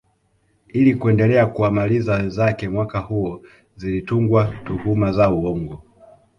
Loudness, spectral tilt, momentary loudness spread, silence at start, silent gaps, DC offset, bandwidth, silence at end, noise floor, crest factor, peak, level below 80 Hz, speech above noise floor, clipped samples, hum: -19 LUFS; -9.5 dB/octave; 12 LU; 0.75 s; none; under 0.1%; 6.8 kHz; 0.6 s; -63 dBFS; 16 dB; -4 dBFS; -42 dBFS; 45 dB; under 0.1%; none